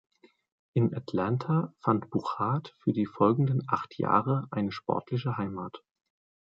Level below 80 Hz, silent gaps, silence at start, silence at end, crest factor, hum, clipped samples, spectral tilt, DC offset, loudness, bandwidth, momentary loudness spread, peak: -64 dBFS; none; 0.75 s; 0.65 s; 20 dB; none; under 0.1%; -9.5 dB/octave; under 0.1%; -29 LUFS; 7.4 kHz; 7 LU; -10 dBFS